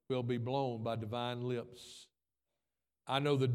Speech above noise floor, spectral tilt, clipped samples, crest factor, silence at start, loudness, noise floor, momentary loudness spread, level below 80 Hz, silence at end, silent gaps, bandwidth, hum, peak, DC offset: over 54 dB; -7 dB/octave; under 0.1%; 20 dB; 0.1 s; -37 LUFS; under -90 dBFS; 19 LU; -76 dBFS; 0 s; none; 13 kHz; none; -16 dBFS; under 0.1%